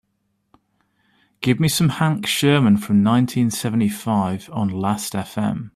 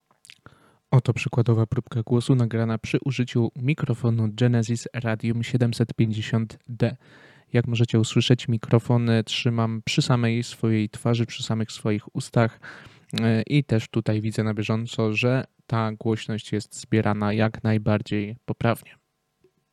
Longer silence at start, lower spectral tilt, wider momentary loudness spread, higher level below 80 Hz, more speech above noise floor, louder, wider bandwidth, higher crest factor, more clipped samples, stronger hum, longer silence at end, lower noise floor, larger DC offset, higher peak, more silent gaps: first, 1.4 s vs 0.9 s; about the same, -5.5 dB/octave vs -6.5 dB/octave; about the same, 8 LU vs 6 LU; about the same, -56 dBFS vs -58 dBFS; first, 51 dB vs 43 dB; first, -19 LUFS vs -24 LUFS; first, 15 kHz vs 11.5 kHz; about the same, 16 dB vs 20 dB; neither; neither; second, 0.05 s vs 0.8 s; first, -70 dBFS vs -66 dBFS; neither; about the same, -4 dBFS vs -4 dBFS; neither